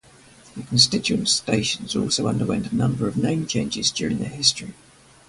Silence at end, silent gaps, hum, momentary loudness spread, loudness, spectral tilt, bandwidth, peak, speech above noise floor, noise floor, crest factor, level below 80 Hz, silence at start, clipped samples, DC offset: 0.55 s; none; none; 9 LU; -21 LUFS; -3.5 dB/octave; 11.5 kHz; -2 dBFS; 27 dB; -50 dBFS; 22 dB; -50 dBFS; 0.45 s; under 0.1%; under 0.1%